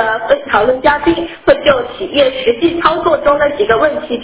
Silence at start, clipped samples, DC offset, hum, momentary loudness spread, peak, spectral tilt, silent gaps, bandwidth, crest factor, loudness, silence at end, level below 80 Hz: 0 s; under 0.1%; under 0.1%; none; 4 LU; 0 dBFS; -8.5 dB/octave; none; 4 kHz; 12 dB; -12 LUFS; 0 s; -38 dBFS